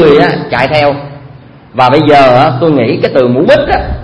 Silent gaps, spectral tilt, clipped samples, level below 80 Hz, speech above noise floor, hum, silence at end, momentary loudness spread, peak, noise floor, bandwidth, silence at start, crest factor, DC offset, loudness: none; -7.5 dB/octave; 2%; -28 dBFS; 25 dB; none; 0 s; 8 LU; 0 dBFS; -33 dBFS; 11 kHz; 0 s; 8 dB; under 0.1%; -8 LUFS